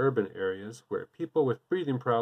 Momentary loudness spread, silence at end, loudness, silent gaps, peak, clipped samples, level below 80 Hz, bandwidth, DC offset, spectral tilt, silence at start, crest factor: 9 LU; 0 s; -31 LUFS; none; -14 dBFS; under 0.1%; -80 dBFS; 10 kHz; under 0.1%; -7.5 dB/octave; 0 s; 16 dB